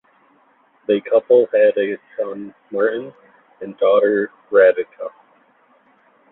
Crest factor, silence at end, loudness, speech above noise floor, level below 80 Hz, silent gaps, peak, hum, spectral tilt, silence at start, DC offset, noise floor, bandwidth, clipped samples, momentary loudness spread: 18 dB; 1.25 s; -17 LUFS; 40 dB; -68 dBFS; none; -2 dBFS; none; -9.5 dB/octave; 0.9 s; under 0.1%; -57 dBFS; 4 kHz; under 0.1%; 19 LU